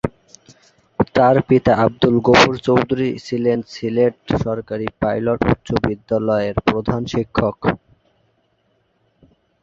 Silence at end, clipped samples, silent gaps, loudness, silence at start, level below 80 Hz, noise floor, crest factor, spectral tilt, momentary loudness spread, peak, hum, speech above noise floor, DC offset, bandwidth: 1.85 s; under 0.1%; none; -18 LUFS; 0.05 s; -40 dBFS; -64 dBFS; 18 dB; -6.5 dB/octave; 10 LU; 0 dBFS; none; 47 dB; under 0.1%; 7.8 kHz